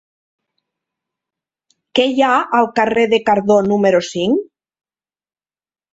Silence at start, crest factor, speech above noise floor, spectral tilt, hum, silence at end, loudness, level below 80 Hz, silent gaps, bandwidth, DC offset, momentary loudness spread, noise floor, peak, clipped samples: 1.95 s; 16 dB; over 76 dB; -5 dB/octave; none; 1.5 s; -15 LUFS; -58 dBFS; none; 8 kHz; under 0.1%; 5 LU; under -90 dBFS; -2 dBFS; under 0.1%